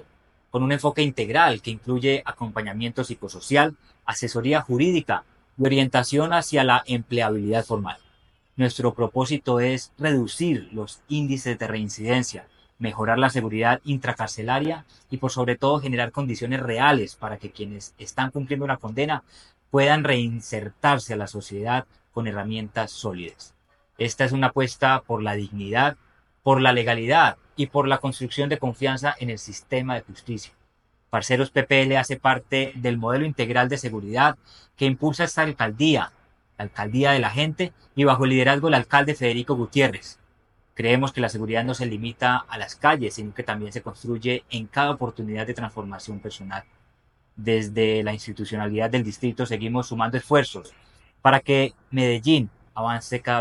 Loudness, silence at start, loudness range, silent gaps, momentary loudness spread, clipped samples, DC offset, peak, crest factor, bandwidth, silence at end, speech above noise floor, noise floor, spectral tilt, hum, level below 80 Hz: -23 LUFS; 0.55 s; 6 LU; none; 14 LU; under 0.1%; under 0.1%; 0 dBFS; 24 dB; 12 kHz; 0 s; 42 dB; -65 dBFS; -5.5 dB/octave; none; -56 dBFS